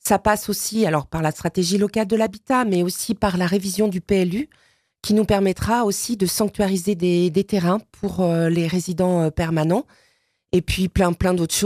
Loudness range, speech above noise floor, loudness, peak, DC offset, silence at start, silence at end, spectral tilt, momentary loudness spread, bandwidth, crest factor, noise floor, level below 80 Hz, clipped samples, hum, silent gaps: 1 LU; 44 dB; -21 LUFS; -4 dBFS; under 0.1%; 0.05 s; 0 s; -5 dB/octave; 4 LU; 15.5 kHz; 18 dB; -64 dBFS; -40 dBFS; under 0.1%; none; none